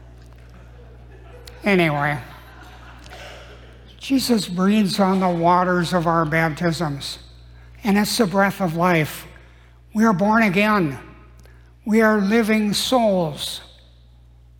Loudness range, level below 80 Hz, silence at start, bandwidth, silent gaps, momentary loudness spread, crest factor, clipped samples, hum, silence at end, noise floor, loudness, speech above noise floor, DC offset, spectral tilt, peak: 6 LU; -46 dBFS; 0.55 s; 18 kHz; none; 18 LU; 16 dB; under 0.1%; 60 Hz at -45 dBFS; 0.95 s; -48 dBFS; -19 LUFS; 30 dB; under 0.1%; -5.5 dB/octave; -4 dBFS